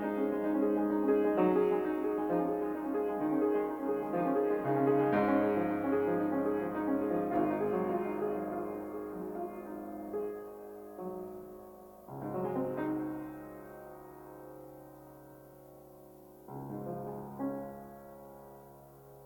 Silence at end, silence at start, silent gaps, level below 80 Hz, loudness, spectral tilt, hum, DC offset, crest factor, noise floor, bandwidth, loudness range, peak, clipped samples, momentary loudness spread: 0 s; 0 s; none; -66 dBFS; -33 LUFS; -8.5 dB/octave; none; under 0.1%; 18 dB; -54 dBFS; 18 kHz; 14 LU; -16 dBFS; under 0.1%; 22 LU